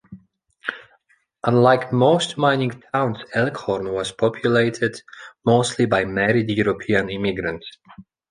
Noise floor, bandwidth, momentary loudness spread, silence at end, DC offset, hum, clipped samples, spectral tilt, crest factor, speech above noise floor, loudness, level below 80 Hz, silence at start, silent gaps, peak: -62 dBFS; 10.5 kHz; 14 LU; 0.3 s; under 0.1%; none; under 0.1%; -5.5 dB/octave; 20 dB; 42 dB; -20 LUFS; -52 dBFS; 0.1 s; none; -2 dBFS